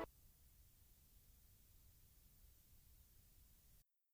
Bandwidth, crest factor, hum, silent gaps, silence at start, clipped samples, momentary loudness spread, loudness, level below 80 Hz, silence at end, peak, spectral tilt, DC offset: over 20 kHz; 28 dB; none; none; 0 s; under 0.1%; 1 LU; -67 LUFS; -72 dBFS; 0 s; -36 dBFS; -4.5 dB/octave; under 0.1%